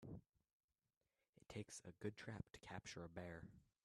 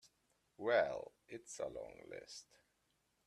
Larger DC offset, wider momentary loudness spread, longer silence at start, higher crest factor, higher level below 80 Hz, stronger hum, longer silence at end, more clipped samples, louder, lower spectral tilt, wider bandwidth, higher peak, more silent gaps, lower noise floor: neither; second, 7 LU vs 19 LU; about the same, 0 s vs 0.05 s; about the same, 22 dB vs 22 dB; about the same, -76 dBFS vs -76 dBFS; neither; second, 0.2 s vs 0.85 s; neither; second, -55 LUFS vs -41 LUFS; first, -5 dB/octave vs -3 dB/octave; about the same, 13 kHz vs 12.5 kHz; second, -36 dBFS vs -20 dBFS; first, 0.29-0.33 s, 0.53-0.68 s, 0.97-1.01 s, 1.29-1.33 s vs none; first, under -90 dBFS vs -81 dBFS